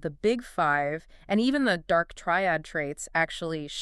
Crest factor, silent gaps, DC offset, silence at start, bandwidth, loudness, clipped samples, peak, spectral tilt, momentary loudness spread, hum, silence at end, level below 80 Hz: 16 dB; none; under 0.1%; 0 s; 12.5 kHz; -27 LUFS; under 0.1%; -10 dBFS; -4.5 dB/octave; 8 LU; none; 0 s; -54 dBFS